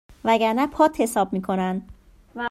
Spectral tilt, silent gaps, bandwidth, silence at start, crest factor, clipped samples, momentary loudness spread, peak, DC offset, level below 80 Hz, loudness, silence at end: -5.5 dB/octave; none; 15.5 kHz; 0.1 s; 18 dB; under 0.1%; 12 LU; -6 dBFS; under 0.1%; -52 dBFS; -22 LUFS; 0 s